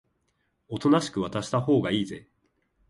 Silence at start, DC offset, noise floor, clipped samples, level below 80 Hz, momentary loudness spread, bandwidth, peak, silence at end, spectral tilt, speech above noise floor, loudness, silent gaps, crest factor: 0.7 s; under 0.1%; -74 dBFS; under 0.1%; -60 dBFS; 13 LU; 11.5 kHz; -10 dBFS; 0.7 s; -6 dB/octave; 48 dB; -26 LUFS; none; 18 dB